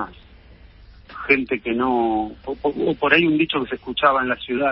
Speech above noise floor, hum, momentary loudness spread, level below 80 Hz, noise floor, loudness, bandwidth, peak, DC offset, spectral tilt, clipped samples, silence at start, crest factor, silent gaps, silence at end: 26 dB; none; 11 LU; -48 dBFS; -46 dBFS; -20 LUFS; 5.8 kHz; 0 dBFS; under 0.1%; -10 dB/octave; under 0.1%; 0 s; 20 dB; none; 0 s